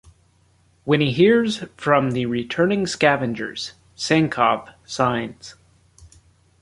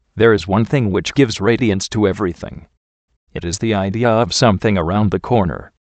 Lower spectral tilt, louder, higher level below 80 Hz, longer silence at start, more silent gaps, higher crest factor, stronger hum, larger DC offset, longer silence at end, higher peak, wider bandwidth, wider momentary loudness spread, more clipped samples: about the same, -5.5 dB/octave vs -5.5 dB/octave; second, -20 LUFS vs -16 LUFS; second, -56 dBFS vs -40 dBFS; first, 0.85 s vs 0.15 s; second, none vs 2.77-3.08 s, 3.16-3.27 s; about the same, 20 dB vs 16 dB; neither; neither; first, 0.55 s vs 0.2 s; about the same, -2 dBFS vs 0 dBFS; first, 11.5 kHz vs 9 kHz; first, 17 LU vs 9 LU; neither